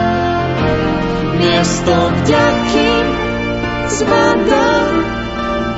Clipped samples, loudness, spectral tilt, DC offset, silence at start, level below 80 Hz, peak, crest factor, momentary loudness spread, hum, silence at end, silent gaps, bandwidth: under 0.1%; -14 LUFS; -5 dB/octave; under 0.1%; 0 s; -30 dBFS; 0 dBFS; 14 dB; 6 LU; none; 0 s; none; 8 kHz